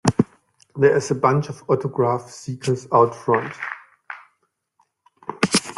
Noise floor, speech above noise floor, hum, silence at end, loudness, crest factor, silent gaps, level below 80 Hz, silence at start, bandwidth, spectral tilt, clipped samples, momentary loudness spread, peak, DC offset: -71 dBFS; 51 dB; none; 0.05 s; -21 LUFS; 22 dB; none; -56 dBFS; 0.05 s; 12.5 kHz; -5 dB/octave; under 0.1%; 20 LU; 0 dBFS; under 0.1%